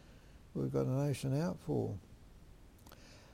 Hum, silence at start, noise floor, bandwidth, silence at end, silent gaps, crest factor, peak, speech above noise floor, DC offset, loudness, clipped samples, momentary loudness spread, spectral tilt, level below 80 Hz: none; 0.05 s; -58 dBFS; 16 kHz; 0 s; none; 16 dB; -24 dBFS; 22 dB; under 0.1%; -37 LUFS; under 0.1%; 22 LU; -7.5 dB/octave; -60 dBFS